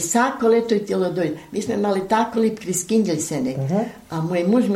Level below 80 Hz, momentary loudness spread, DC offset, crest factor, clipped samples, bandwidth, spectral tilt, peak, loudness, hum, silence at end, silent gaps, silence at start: -58 dBFS; 7 LU; under 0.1%; 14 dB; under 0.1%; 16 kHz; -5 dB/octave; -6 dBFS; -21 LUFS; none; 0 s; none; 0 s